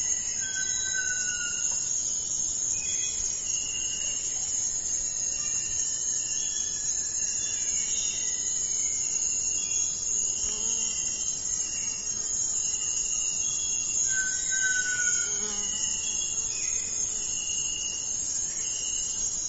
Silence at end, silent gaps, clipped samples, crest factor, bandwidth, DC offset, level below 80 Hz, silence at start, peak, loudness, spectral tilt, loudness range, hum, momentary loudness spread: 0 s; none; under 0.1%; 16 dB; 8.2 kHz; under 0.1%; -54 dBFS; 0 s; -14 dBFS; -26 LUFS; 1.5 dB/octave; 2 LU; none; 3 LU